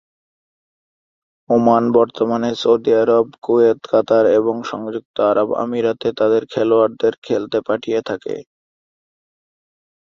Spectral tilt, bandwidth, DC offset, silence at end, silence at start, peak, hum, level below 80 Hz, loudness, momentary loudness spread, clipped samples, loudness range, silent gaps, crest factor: -6.5 dB/octave; 7.2 kHz; under 0.1%; 1.65 s; 1.5 s; -2 dBFS; none; -60 dBFS; -17 LUFS; 10 LU; under 0.1%; 5 LU; 3.38-3.42 s, 5.05-5.14 s, 7.18-7.22 s; 16 dB